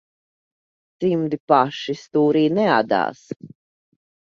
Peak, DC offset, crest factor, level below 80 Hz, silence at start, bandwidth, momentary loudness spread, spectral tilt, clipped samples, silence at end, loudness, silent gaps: -2 dBFS; under 0.1%; 20 dB; -66 dBFS; 1 s; 7.4 kHz; 14 LU; -7 dB/octave; under 0.1%; 0.75 s; -20 LUFS; 1.40-1.48 s, 3.36-3.40 s